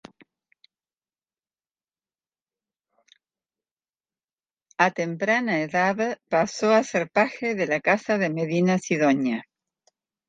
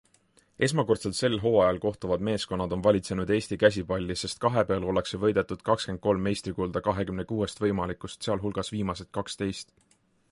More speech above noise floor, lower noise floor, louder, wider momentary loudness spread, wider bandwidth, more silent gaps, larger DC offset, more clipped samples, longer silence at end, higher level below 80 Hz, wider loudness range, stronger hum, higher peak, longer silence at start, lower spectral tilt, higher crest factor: first, over 67 dB vs 37 dB; first, under -90 dBFS vs -64 dBFS; first, -23 LUFS vs -28 LUFS; second, 5 LU vs 8 LU; second, 9.4 kHz vs 11.5 kHz; neither; neither; neither; first, 0.85 s vs 0.7 s; second, -72 dBFS vs -50 dBFS; about the same, 6 LU vs 5 LU; neither; about the same, -4 dBFS vs -6 dBFS; first, 4.8 s vs 0.6 s; about the same, -5.5 dB/octave vs -5.5 dB/octave; about the same, 22 dB vs 22 dB